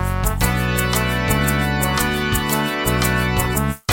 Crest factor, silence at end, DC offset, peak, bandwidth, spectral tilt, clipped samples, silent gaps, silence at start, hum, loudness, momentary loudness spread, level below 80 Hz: 16 dB; 0 s; under 0.1%; -2 dBFS; 17 kHz; -4.5 dB/octave; under 0.1%; none; 0 s; none; -19 LUFS; 2 LU; -26 dBFS